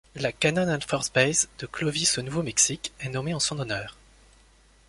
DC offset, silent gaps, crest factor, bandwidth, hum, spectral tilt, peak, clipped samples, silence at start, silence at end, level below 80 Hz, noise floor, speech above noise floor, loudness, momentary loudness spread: under 0.1%; none; 22 dB; 11.5 kHz; none; -3 dB/octave; -6 dBFS; under 0.1%; 0.15 s; 0.95 s; -54 dBFS; -58 dBFS; 31 dB; -25 LUFS; 10 LU